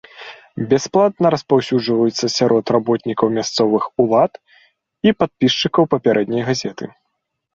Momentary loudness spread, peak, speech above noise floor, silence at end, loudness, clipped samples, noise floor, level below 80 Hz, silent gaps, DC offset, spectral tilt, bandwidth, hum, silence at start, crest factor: 10 LU; 0 dBFS; 58 dB; 0.65 s; -17 LUFS; under 0.1%; -74 dBFS; -56 dBFS; none; under 0.1%; -5 dB/octave; 7.8 kHz; none; 0.15 s; 16 dB